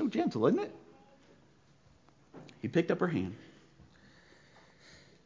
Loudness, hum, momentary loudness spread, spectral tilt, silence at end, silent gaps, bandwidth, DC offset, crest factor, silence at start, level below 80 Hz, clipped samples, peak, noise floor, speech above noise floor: -32 LUFS; none; 25 LU; -7.5 dB/octave; 1.8 s; none; 7.6 kHz; under 0.1%; 22 dB; 0 s; -66 dBFS; under 0.1%; -14 dBFS; -64 dBFS; 33 dB